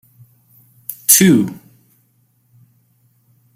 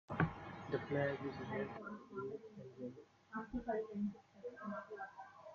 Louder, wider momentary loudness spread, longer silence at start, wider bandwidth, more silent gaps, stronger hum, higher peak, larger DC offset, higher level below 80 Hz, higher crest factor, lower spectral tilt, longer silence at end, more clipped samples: first, -12 LUFS vs -45 LUFS; first, 22 LU vs 13 LU; first, 0.9 s vs 0.1 s; first, 16.5 kHz vs 7.2 kHz; neither; neither; first, 0 dBFS vs -22 dBFS; neither; first, -58 dBFS vs -66 dBFS; about the same, 20 dB vs 22 dB; second, -3.5 dB/octave vs -6.5 dB/octave; first, 2 s vs 0 s; neither